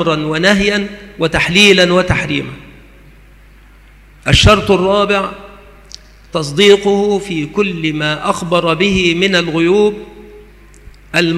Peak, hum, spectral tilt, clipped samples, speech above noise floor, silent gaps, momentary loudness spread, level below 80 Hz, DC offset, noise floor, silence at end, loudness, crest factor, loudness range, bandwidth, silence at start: 0 dBFS; 50 Hz at -40 dBFS; -4.5 dB/octave; under 0.1%; 29 dB; none; 12 LU; -32 dBFS; under 0.1%; -41 dBFS; 0 s; -12 LUFS; 14 dB; 2 LU; 14 kHz; 0 s